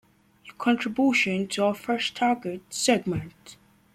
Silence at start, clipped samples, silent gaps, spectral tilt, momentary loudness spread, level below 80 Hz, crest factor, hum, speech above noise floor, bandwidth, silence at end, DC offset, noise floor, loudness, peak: 0.45 s; under 0.1%; none; -4 dB/octave; 10 LU; -62 dBFS; 18 dB; none; 27 dB; 15.5 kHz; 0.4 s; under 0.1%; -52 dBFS; -25 LUFS; -8 dBFS